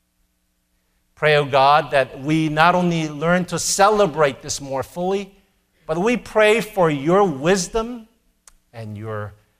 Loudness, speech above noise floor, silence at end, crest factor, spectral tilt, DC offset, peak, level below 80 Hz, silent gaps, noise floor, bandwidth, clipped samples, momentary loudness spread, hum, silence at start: -18 LUFS; 49 dB; 0.3 s; 20 dB; -4.5 dB/octave; under 0.1%; 0 dBFS; -48 dBFS; none; -67 dBFS; 16 kHz; under 0.1%; 15 LU; none; 1.2 s